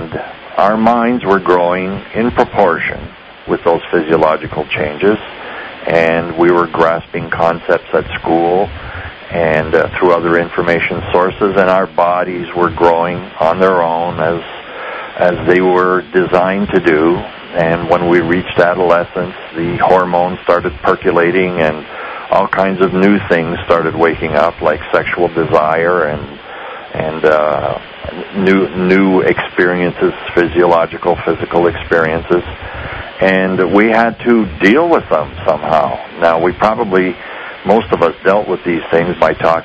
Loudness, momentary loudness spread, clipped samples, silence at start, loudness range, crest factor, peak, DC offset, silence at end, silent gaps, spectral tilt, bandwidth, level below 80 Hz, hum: -13 LUFS; 11 LU; 0.4%; 0 s; 2 LU; 12 dB; 0 dBFS; under 0.1%; 0 s; none; -7.5 dB/octave; 8 kHz; -38 dBFS; none